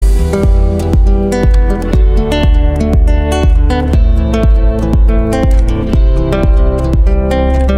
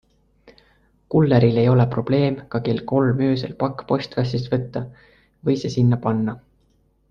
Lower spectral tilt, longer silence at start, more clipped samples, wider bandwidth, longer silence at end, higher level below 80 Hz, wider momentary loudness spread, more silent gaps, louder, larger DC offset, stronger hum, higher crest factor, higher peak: about the same, -7.5 dB/octave vs -8.5 dB/octave; second, 0 s vs 1.1 s; neither; first, 10.5 kHz vs 7 kHz; second, 0 s vs 0.7 s; first, -10 dBFS vs -50 dBFS; second, 1 LU vs 11 LU; neither; first, -12 LUFS vs -21 LUFS; neither; neither; second, 8 dB vs 18 dB; first, 0 dBFS vs -4 dBFS